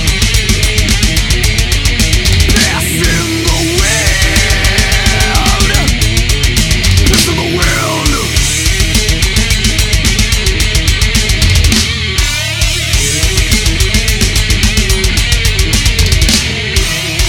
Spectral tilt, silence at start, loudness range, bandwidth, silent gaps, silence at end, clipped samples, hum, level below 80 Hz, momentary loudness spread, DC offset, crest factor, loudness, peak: -3 dB/octave; 0 s; 1 LU; 19 kHz; none; 0 s; under 0.1%; none; -14 dBFS; 3 LU; under 0.1%; 10 dB; -10 LUFS; 0 dBFS